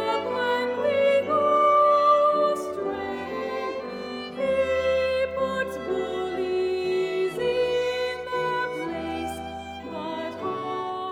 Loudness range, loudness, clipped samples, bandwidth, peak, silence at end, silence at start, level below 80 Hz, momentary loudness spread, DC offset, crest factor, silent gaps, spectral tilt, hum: 6 LU; -25 LUFS; under 0.1%; 15 kHz; -10 dBFS; 0 s; 0 s; -56 dBFS; 13 LU; under 0.1%; 14 dB; none; -5 dB/octave; none